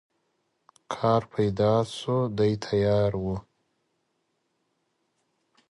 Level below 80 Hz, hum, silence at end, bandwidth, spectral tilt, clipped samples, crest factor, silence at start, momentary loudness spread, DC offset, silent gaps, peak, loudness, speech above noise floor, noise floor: -52 dBFS; none; 2.3 s; 11.5 kHz; -7 dB/octave; under 0.1%; 18 dB; 0.9 s; 9 LU; under 0.1%; none; -10 dBFS; -26 LUFS; 51 dB; -76 dBFS